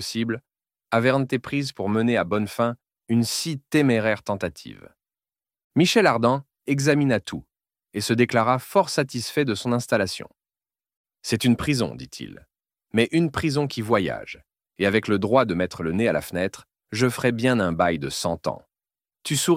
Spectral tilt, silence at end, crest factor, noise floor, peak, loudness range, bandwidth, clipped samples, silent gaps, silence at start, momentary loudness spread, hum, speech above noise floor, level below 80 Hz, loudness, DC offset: -5 dB/octave; 0 s; 20 dB; under -90 dBFS; -4 dBFS; 3 LU; 16.5 kHz; under 0.1%; 5.64-5.70 s, 10.96-11.04 s; 0 s; 14 LU; none; over 67 dB; -54 dBFS; -23 LUFS; under 0.1%